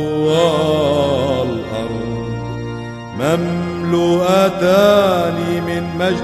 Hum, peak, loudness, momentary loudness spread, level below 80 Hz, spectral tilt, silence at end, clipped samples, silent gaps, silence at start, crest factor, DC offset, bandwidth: none; 0 dBFS; -16 LUFS; 12 LU; -42 dBFS; -6 dB/octave; 0 s; under 0.1%; none; 0 s; 16 dB; under 0.1%; 14 kHz